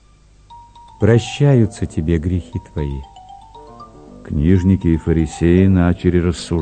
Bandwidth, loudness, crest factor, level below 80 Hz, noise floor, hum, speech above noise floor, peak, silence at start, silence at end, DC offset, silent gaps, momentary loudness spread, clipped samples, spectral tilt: 9.2 kHz; -16 LUFS; 16 dB; -32 dBFS; -48 dBFS; 50 Hz at -40 dBFS; 33 dB; 0 dBFS; 0.5 s; 0 s; under 0.1%; none; 11 LU; under 0.1%; -7.5 dB/octave